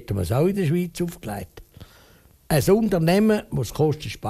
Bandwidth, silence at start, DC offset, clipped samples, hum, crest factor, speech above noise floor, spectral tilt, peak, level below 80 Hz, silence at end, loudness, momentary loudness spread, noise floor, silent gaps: 15.5 kHz; 0 s; under 0.1%; under 0.1%; none; 16 dB; 32 dB; -6.5 dB/octave; -8 dBFS; -44 dBFS; 0 s; -22 LUFS; 14 LU; -53 dBFS; none